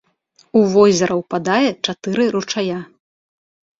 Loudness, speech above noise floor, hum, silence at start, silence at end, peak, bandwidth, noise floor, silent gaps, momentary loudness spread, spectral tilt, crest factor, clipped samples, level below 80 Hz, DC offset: -17 LUFS; 41 dB; none; 0.55 s; 0.95 s; -2 dBFS; 7.8 kHz; -57 dBFS; none; 10 LU; -5 dB/octave; 16 dB; under 0.1%; -58 dBFS; under 0.1%